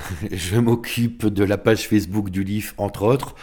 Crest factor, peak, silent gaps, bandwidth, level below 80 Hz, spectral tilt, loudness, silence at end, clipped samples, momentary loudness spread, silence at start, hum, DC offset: 18 dB; -4 dBFS; none; 19 kHz; -44 dBFS; -6 dB/octave; -21 LUFS; 0 s; under 0.1%; 7 LU; 0 s; none; under 0.1%